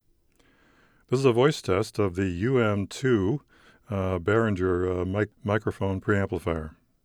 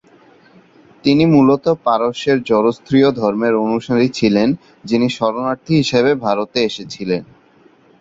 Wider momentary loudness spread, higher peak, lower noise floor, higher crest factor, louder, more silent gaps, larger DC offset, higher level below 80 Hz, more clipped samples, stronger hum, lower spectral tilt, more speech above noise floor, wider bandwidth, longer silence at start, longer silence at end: about the same, 7 LU vs 9 LU; second, -8 dBFS vs -2 dBFS; first, -64 dBFS vs -50 dBFS; about the same, 18 dB vs 14 dB; second, -26 LUFS vs -16 LUFS; neither; neither; about the same, -52 dBFS vs -52 dBFS; neither; neither; about the same, -7 dB/octave vs -6.5 dB/octave; about the same, 38 dB vs 35 dB; first, 13.5 kHz vs 7.8 kHz; about the same, 1.1 s vs 1.05 s; second, 0.35 s vs 0.75 s